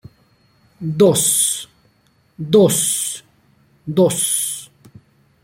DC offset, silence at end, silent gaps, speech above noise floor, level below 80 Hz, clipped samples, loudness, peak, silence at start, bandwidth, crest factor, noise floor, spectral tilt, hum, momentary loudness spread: under 0.1%; 0.8 s; none; 43 dB; -60 dBFS; under 0.1%; -16 LUFS; -2 dBFS; 0.8 s; 16.5 kHz; 18 dB; -58 dBFS; -4 dB/octave; none; 18 LU